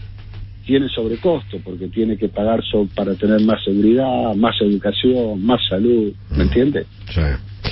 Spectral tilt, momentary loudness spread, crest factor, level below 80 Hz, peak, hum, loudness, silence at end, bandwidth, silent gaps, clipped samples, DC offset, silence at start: -11 dB/octave; 10 LU; 14 dB; -30 dBFS; -2 dBFS; none; -18 LUFS; 0 s; 5.8 kHz; none; under 0.1%; under 0.1%; 0 s